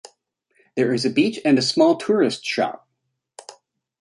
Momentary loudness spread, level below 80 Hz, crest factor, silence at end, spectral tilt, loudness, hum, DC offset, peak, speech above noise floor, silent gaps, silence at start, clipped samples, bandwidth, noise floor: 9 LU; -68 dBFS; 18 dB; 0.5 s; -4.5 dB/octave; -20 LUFS; none; under 0.1%; -4 dBFS; 57 dB; none; 0.75 s; under 0.1%; 11.5 kHz; -76 dBFS